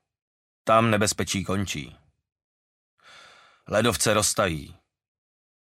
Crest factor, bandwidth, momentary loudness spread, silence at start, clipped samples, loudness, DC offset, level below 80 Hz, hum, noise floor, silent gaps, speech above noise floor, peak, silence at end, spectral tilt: 22 dB; 16 kHz; 13 LU; 0.65 s; under 0.1%; -24 LUFS; under 0.1%; -52 dBFS; none; -53 dBFS; 2.44-2.98 s; 29 dB; -4 dBFS; 0.9 s; -3.5 dB/octave